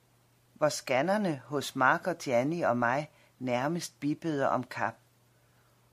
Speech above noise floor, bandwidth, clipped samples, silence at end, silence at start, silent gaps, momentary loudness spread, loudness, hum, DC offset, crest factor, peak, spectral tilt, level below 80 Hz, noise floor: 36 dB; 15.5 kHz; under 0.1%; 1 s; 0.6 s; none; 8 LU; -30 LUFS; none; under 0.1%; 22 dB; -10 dBFS; -5 dB/octave; -74 dBFS; -66 dBFS